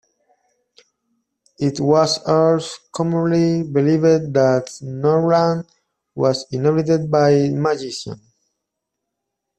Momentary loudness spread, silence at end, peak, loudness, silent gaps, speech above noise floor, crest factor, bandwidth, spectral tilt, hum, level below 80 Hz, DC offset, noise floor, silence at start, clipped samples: 12 LU; 1.45 s; -2 dBFS; -18 LUFS; none; 62 dB; 16 dB; 9.2 kHz; -6.5 dB/octave; none; -58 dBFS; under 0.1%; -79 dBFS; 1.6 s; under 0.1%